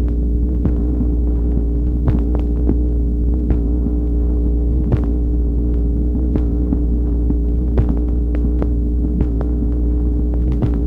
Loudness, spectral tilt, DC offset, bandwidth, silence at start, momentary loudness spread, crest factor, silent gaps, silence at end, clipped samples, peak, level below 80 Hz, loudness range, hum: -18 LUFS; -12 dB/octave; under 0.1%; 2.2 kHz; 0 s; 1 LU; 14 dB; none; 0 s; under 0.1%; -2 dBFS; -16 dBFS; 0 LU; none